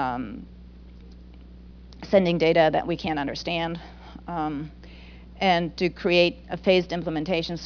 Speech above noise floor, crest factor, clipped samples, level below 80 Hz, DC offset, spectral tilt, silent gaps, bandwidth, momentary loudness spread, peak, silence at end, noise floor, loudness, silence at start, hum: 21 dB; 20 dB; under 0.1%; -46 dBFS; under 0.1%; -6.5 dB/octave; none; 5.4 kHz; 20 LU; -6 dBFS; 0 s; -45 dBFS; -24 LUFS; 0 s; 60 Hz at -45 dBFS